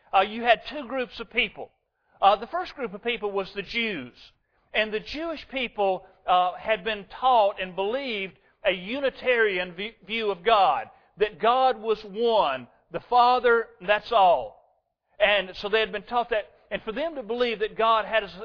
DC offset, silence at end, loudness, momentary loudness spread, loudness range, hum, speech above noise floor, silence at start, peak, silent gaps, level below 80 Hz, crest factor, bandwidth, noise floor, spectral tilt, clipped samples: under 0.1%; 0 s; -25 LUFS; 11 LU; 5 LU; none; 44 dB; 0.15 s; -4 dBFS; none; -56 dBFS; 22 dB; 5.4 kHz; -69 dBFS; -5.5 dB/octave; under 0.1%